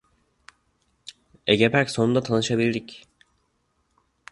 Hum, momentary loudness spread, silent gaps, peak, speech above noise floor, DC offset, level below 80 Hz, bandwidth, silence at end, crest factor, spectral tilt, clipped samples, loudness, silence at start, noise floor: none; 25 LU; none; -2 dBFS; 49 dB; under 0.1%; -58 dBFS; 11.5 kHz; 1.35 s; 24 dB; -5 dB/octave; under 0.1%; -22 LUFS; 1.45 s; -70 dBFS